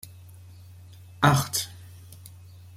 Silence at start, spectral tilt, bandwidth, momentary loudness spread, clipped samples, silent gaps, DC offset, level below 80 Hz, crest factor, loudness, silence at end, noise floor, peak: 0.05 s; -4 dB/octave; 16 kHz; 27 LU; under 0.1%; none; under 0.1%; -58 dBFS; 26 dB; -24 LUFS; 0.5 s; -47 dBFS; -4 dBFS